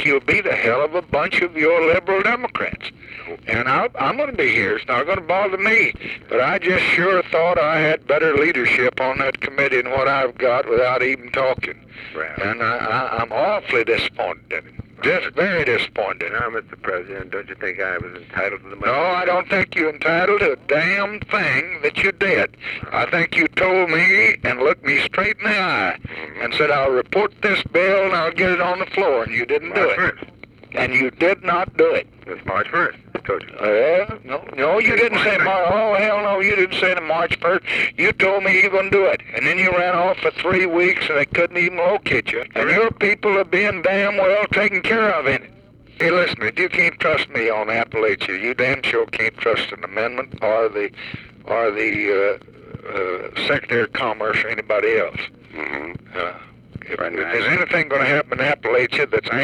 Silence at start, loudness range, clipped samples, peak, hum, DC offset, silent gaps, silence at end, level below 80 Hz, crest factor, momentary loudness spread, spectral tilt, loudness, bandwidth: 0 s; 5 LU; under 0.1%; -6 dBFS; none; under 0.1%; none; 0 s; -50 dBFS; 14 dB; 11 LU; -5.5 dB/octave; -18 LUFS; 11.5 kHz